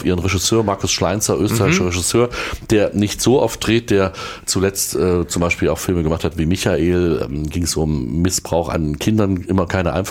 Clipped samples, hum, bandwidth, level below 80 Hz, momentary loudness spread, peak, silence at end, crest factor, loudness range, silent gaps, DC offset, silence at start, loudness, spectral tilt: under 0.1%; none; 17 kHz; -36 dBFS; 4 LU; -4 dBFS; 0 s; 14 dB; 2 LU; none; under 0.1%; 0 s; -18 LUFS; -4.5 dB/octave